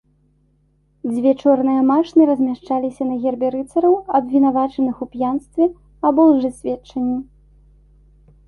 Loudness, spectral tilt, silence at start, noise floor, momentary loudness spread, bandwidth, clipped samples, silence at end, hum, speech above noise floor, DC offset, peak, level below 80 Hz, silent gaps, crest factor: -18 LUFS; -7.5 dB/octave; 1.05 s; -60 dBFS; 9 LU; 11 kHz; under 0.1%; 1.25 s; 50 Hz at -50 dBFS; 43 dB; under 0.1%; -2 dBFS; -52 dBFS; none; 16 dB